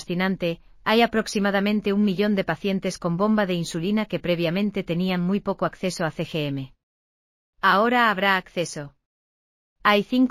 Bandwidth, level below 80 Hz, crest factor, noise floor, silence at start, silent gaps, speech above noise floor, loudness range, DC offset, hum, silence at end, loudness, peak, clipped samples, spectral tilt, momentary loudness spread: 15.5 kHz; -54 dBFS; 18 dB; under -90 dBFS; 0 s; 6.83-7.53 s, 9.06-9.76 s; over 67 dB; 3 LU; under 0.1%; none; 0 s; -23 LUFS; -4 dBFS; under 0.1%; -5.5 dB/octave; 10 LU